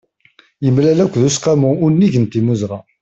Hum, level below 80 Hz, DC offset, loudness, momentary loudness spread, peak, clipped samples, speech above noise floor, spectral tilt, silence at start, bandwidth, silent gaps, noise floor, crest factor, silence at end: none; -50 dBFS; under 0.1%; -14 LUFS; 7 LU; -2 dBFS; under 0.1%; 38 dB; -6.5 dB/octave; 0.6 s; 8.2 kHz; none; -52 dBFS; 12 dB; 0.2 s